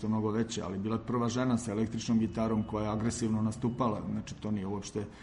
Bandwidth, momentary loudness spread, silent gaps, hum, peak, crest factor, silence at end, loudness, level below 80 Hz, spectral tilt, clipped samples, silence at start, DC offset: 11 kHz; 6 LU; none; none; -18 dBFS; 14 dB; 0 s; -33 LUFS; -54 dBFS; -6.5 dB/octave; under 0.1%; 0 s; under 0.1%